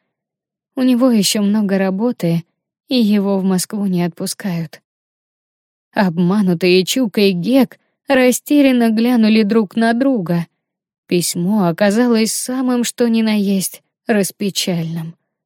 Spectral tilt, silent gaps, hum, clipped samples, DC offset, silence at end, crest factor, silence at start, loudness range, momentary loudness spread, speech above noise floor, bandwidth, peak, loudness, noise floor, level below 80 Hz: -5 dB/octave; 4.84-5.91 s, 10.98-11.03 s; none; under 0.1%; under 0.1%; 0.35 s; 14 dB; 0.75 s; 5 LU; 9 LU; 70 dB; 17 kHz; -2 dBFS; -16 LUFS; -84 dBFS; -62 dBFS